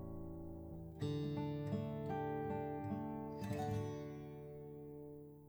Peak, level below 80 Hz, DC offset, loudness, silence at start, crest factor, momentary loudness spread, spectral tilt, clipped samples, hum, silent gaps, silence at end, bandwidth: -30 dBFS; -62 dBFS; under 0.1%; -45 LUFS; 0 s; 14 dB; 11 LU; -8 dB/octave; under 0.1%; none; none; 0 s; over 20 kHz